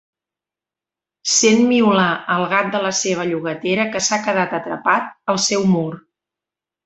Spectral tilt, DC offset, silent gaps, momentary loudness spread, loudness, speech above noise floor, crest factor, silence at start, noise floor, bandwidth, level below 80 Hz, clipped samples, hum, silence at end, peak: -3.5 dB/octave; under 0.1%; none; 9 LU; -17 LUFS; 71 dB; 18 dB; 1.25 s; -88 dBFS; 8.2 kHz; -62 dBFS; under 0.1%; none; 0.85 s; -2 dBFS